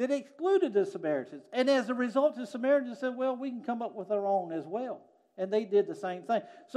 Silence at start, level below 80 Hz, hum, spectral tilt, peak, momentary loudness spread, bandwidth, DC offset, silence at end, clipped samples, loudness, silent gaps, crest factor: 0 s; under -90 dBFS; none; -5.5 dB/octave; -14 dBFS; 9 LU; 11 kHz; under 0.1%; 0 s; under 0.1%; -31 LUFS; none; 16 dB